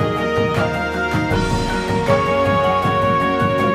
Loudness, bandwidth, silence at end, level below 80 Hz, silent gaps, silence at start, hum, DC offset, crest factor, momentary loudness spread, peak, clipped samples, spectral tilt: -18 LUFS; 15.5 kHz; 0 s; -34 dBFS; none; 0 s; none; under 0.1%; 16 dB; 4 LU; -2 dBFS; under 0.1%; -6 dB/octave